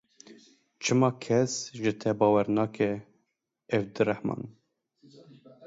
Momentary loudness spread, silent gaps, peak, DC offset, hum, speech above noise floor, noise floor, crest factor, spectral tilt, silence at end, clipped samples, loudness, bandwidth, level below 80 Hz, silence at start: 10 LU; none; -8 dBFS; under 0.1%; none; 52 dB; -79 dBFS; 20 dB; -5.5 dB/octave; 0 s; under 0.1%; -28 LUFS; 8 kHz; -68 dBFS; 0.3 s